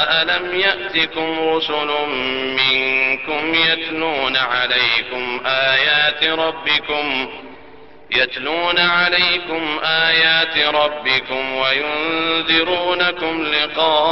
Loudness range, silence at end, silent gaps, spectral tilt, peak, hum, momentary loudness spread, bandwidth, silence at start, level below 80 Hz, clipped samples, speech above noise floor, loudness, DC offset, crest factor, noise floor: 2 LU; 0 s; none; -4.5 dB/octave; -2 dBFS; none; 6 LU; 6.2 kHz; 0 s; -52 dBFS; under 0.1%; 25 dB; -16 LUFS; 0.6%; 16 dB; -42 dBFS